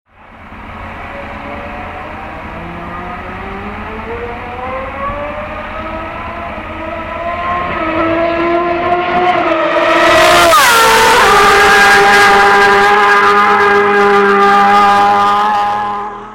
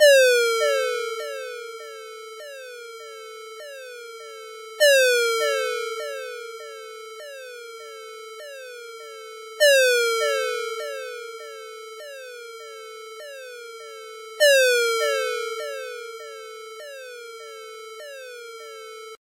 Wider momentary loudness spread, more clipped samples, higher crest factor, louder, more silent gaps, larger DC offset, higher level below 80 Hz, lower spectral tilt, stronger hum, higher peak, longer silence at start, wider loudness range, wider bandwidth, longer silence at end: about the same, 19 LU vs 21 LU; neither; second, 10 dB vs 22 dB; first, -8 LUFS vs -21 LUFS; neither; neither; first, -34 dBFS vs under -90 dBFS; first, -3 dB/octave vs 5 dB/octave; neither; first, 0 dBFS vs -4 dBFS; first, 0.3 s vs 0 s; first, 18 LU vs 14 LU; about the same, 17 kHz vs 16 kHz; about the same, 0 s vs 0.05 s